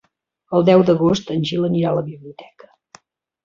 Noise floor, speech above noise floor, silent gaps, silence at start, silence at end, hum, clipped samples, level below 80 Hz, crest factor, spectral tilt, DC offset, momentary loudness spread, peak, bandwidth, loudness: -50 dBFS; 33 dB; none; 0.5 s; 1 s; none; under 0.1%; -54 dBFS; 16 dB; -7.5 dB/octave; under 0.1%; 11 LU; -2 dBFS; 7.4 kHz; -17 LUFS